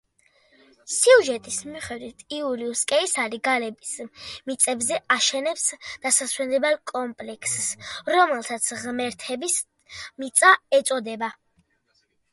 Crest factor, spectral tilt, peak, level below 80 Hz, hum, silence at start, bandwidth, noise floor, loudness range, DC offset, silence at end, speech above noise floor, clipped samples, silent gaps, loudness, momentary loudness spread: 24 dB; -0.5 dB/octave; -2 dBFS; -66 dBFS; none; 0.85 s; 12 kHz; -69 dBFS; 3 LU; under 0.1%; 1 s; 45 dB; under 0.1%; none; -22 LUFS; 17 LU